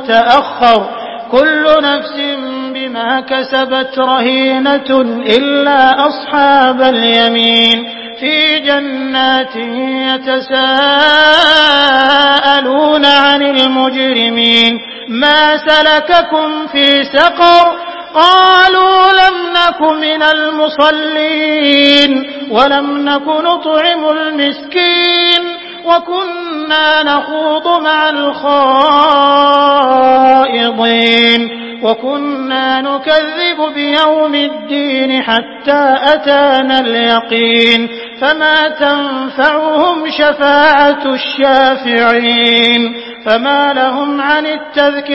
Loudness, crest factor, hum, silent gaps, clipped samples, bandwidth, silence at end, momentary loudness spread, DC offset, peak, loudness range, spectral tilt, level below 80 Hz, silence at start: -9 LUFS; 10 dB; none; none; 0.4%; 8 kHz; 0 s; 8 LU; under 0.1%; 0 dBFS; 4 LU; -4 dB/octave; -50 dBFS; 0 s